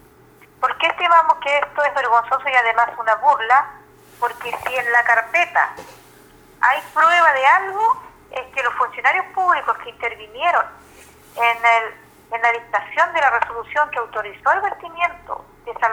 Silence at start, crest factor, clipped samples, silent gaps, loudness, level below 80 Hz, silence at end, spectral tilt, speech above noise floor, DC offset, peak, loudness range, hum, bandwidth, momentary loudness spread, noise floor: 0.6 s; 18 dB; under 0.1%; none; -18 LUFS; -58 dBFS; 0 s; -2 dB/octave; 31 dB; under 0.1%; -2 dBFS; 4 LU; none; over 20 kHz; 12 LU; -49 dBFS